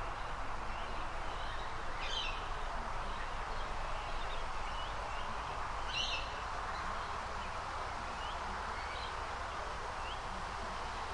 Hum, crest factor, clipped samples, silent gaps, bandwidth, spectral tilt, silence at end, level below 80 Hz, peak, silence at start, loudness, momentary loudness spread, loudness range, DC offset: none; 16 dB; under 0.1%; none; 11 kHz; -3 dB/octave; 0 s; -44 dBFS; -24 dBFS; 0 s; -41 LUFS; 4 LU; 1 LU; under 0.1%